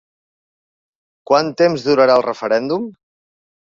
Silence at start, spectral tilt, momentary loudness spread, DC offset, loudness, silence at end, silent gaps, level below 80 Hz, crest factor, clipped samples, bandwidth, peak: 1.3 s; -5.5 dB/octave; 10 LU; under 0.1%; -16 LUFS; 0.9 s; none; -62 dBFS; 18 dB; under 0.1%; 7.4 kHz; -2 dBFS